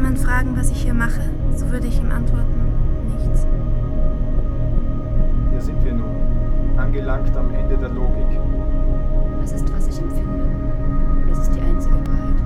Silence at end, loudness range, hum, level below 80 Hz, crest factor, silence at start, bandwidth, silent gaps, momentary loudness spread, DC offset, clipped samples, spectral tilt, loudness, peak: 0 s; 1 LU; none; -16 dBFS; 12 dB; 0 s; 11.5 kHz; none; 3 LU; under 0.1%; under 0.1%; -7.5 dB/octave; -23 LUFS; -4 dBFS